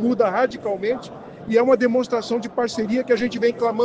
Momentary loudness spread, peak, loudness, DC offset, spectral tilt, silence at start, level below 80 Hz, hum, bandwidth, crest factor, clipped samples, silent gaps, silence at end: 8 LU; -4 dBFS; -21 LUFS; under 0.1%; -5.5 dB/octave; 0 s; -58 dBFS; none; 9 kHz; 16 dB; under 0.1%; none; 0 s